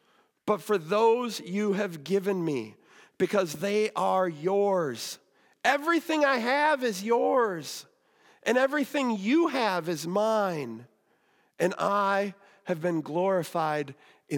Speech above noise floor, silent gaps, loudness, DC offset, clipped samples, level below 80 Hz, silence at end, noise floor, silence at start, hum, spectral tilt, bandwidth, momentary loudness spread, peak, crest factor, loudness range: 41 dB; none; -27 LUFS; under 0.1%; under 0.1%; -86 dBFS; 0 s; -68 dBFS; 0.45 s; none; -5 dB/octave; 18 kHz; 11 LU; -10 dBFS; 18 dB; 3 LU